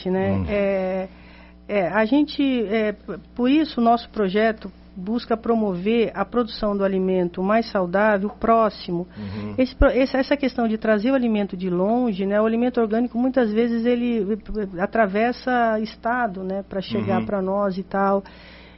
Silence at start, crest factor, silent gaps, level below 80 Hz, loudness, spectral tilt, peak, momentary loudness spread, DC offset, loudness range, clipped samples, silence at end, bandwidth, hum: 0 s; 18 dB; none; -40 dBFS; -22 LUFS; -5 dB/octave; -4 dBFS; 8 LU; under 0.1%; 2 LU; under 0.1%; 0.1 s; 6 kHz; none